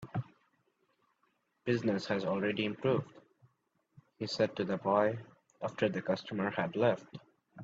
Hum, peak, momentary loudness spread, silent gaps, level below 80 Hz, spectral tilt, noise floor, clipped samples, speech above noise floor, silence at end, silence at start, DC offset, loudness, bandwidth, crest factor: none; -16 dBFS; 12 LU; none; -74 dBFS; -6.5 dB/octave; -78 dBFS; under 0.1%; 45 dB; 0 s; 0 s; under 0.1%; -34 LUFS; 7.8 kHz; 20 dB